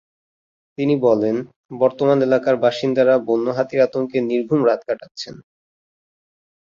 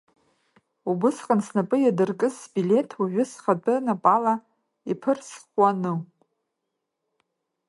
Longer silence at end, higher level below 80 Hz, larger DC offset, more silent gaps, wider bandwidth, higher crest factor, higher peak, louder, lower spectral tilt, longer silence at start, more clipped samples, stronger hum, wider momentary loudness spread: second, 1.25 s vs 1.65 s; first, -64 dBFS vs -76 dBFS; neither; first, 1.56-1.69 s, 5.11-5.15 s vs none; second, 7.4 kHz vs 11.5 kHz; about the same, 18 dB vs 22 dB; about the same, -2 dBFS vs -4 dBFS; first, -18 LUFS vs -24 LUFS; about the same, -7 dB/octave vs -7 dB/octave; about the same, 0.8 s vs 0.85 s; neither; neither; first, 12 LU vs 9 LU